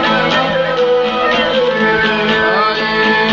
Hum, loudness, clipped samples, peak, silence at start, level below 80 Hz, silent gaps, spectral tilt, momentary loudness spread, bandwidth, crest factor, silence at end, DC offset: none; -13 LUFS; under 0.1%; 0 dBFS; 0 s; -42 dBFS; none; -1.5 dB/octave; 1 LU; 7.6 kHz; 12 dB; 0 s; under 0.1%